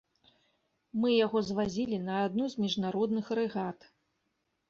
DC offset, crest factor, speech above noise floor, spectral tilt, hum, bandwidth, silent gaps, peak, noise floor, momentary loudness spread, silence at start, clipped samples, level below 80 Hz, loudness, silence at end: under 0.1%; 16 dB; 49 dB; -6 dB/octave; none; 7.4 kHz; none; -16 dBFS; -80 dBFS; 9 LU; 0.95 s; under 0.1%; -68 dBFS; -31 LUFS; 0.95 s